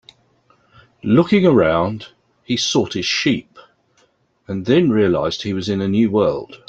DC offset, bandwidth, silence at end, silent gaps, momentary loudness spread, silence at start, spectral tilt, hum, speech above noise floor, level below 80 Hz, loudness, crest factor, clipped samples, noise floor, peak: under 0.1%; 8.2 kHz; 0.15 s; none; 11 LU; 1.05 s; -5.5 dB/octave; none; 43 dB; -52 dBFS; -17 LUFS; 16 dB; under 0.1%; -60 dBFS; -2 dBFS